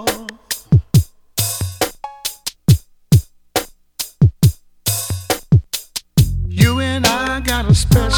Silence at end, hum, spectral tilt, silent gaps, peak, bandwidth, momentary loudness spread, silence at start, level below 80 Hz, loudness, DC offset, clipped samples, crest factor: 0 s; none; -5 dB/octave; none; 0 dBFS; 18.5 kHz; 11 LU; 0 s; -28 dBFS; -17 LUFS; under 0.1%; under 0.1%; 16 dB